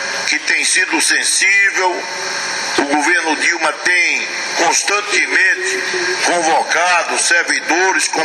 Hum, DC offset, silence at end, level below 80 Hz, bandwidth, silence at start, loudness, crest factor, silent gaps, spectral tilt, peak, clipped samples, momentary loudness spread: none; under 0.1%; 0 s; -70 dBFS; 12.5 kHz; 0 s; -13 LUFS; 16 dB; none; 0.5 dB/octave; 0 dBFS; under 0.1%; 6 LU